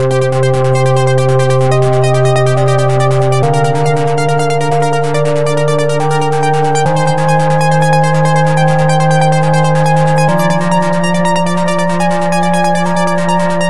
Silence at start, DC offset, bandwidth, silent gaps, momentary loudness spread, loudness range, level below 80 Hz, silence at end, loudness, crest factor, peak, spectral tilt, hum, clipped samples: 0 s; 10%; 12 kHz; none; 3 LU; 2 LU; -44 dBFS; 0 s; -11 LUFS; 10 dB; 0 dBFS; -6 dB/octave; none; under 0.1%